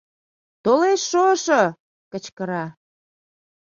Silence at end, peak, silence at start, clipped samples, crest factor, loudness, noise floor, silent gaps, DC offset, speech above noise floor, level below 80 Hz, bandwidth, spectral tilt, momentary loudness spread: 1.05 s; -4 dBFS; 0.65 s; under 0.1%; 20 dB; -20 LUFS; under -90 dBFS; 1.80-2.11 s, 2.32-2.37 s; under 0.1%; over 71 dB; -68 dBFS; 7.4 kHz; -4 dB/octave; 17 LU